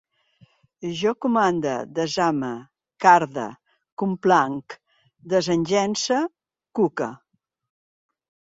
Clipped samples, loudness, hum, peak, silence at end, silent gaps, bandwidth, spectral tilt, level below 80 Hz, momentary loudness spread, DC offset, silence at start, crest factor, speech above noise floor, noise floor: under 0.1%; -22 LUFS; none; -2 dBFS; 1.4 s; 3.92-3.97 s; 7.8 kHz; -4.5 dB/octave; -66 dBFS; 16 LU; under 0.1%; 0.8 s; 22 dB; 37 dB; -58 dBFS